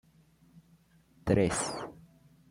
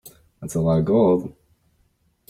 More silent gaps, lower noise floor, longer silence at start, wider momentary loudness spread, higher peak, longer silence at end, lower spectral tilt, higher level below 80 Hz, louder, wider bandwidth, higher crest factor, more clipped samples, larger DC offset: neither; about the same, -64 dBFS vs -65 dBFS; first, 1.25 s vs 0.05 s; second, 15 LU vs 20 LU; second, -14 dBFS vs -6 dBFS; second, 0.55 s vs 1 s; second, -5 dB/octave vs -8.5 dB/octave; about the same, -56 dBFS vs -52 dBFS; second, -31 LUFS vs -20 LUFS; about the same, 16.5 kHz vs 16 kHz; first, 22 dB vs 16 dB; neither; neither